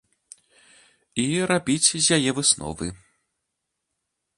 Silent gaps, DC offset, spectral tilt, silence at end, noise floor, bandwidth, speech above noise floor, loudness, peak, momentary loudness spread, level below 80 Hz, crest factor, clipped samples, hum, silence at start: none; under 0.1%; -2.5 dB/octave; 1.4 s; -80 dBFS; 11.5 kHz; 58 dB; -21 LUFS; -4 dBFS; 14 LU; -54 dBFS; 22 dB; under 0.1%; none; 1.15 s